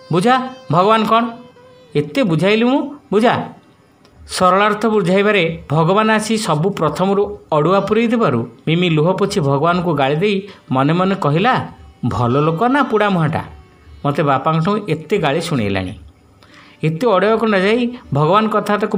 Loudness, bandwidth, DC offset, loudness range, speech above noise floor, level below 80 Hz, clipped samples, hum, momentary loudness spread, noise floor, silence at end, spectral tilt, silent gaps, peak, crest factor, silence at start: -16 LUFS; 16 kHz; under 0.1%; 3 LU; 34 dB; -48 dBFS; under 0.1%; none; 8 LU; -49 dBFS; 0 s; -6.5 dB/octave; none; 0 dBFS; 16 dB; 0.1 s